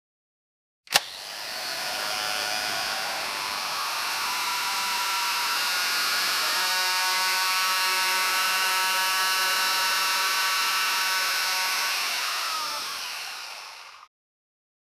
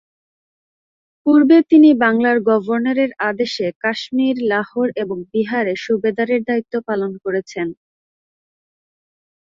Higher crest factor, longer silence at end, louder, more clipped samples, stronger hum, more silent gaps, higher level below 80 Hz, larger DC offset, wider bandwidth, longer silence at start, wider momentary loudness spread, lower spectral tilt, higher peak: first, 26 dB vs 16 dB; second, 0.95 s vs 1.75 s; second, -24 LUFS vs -17 LUFS; neither; neither; second, none vs 3.76-3.81 s; second, -70 dBFS vs -64 dBFS; neither; first, 16.5 kHz vs 7.4 kHz; second, 0.9 s vs 1.25 s; second, 9 LU vs 12 LU; second, 2 dB/octave vs -6 dB/octave; about the same, 0 dBFS vs -2 dBFS